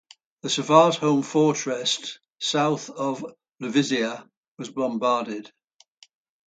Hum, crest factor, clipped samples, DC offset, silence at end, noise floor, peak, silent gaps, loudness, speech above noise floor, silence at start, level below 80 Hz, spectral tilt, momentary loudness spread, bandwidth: none; 24 dB; under 0.1%; under 0.1%; 1 s; -57 dBFS; -2 dBFS; 4.37-4.55 s; -23 LUFS; 34 dB; 0.45 s; -74 dBFS; -4 dB/octave; 18 LU; 9.4 kHz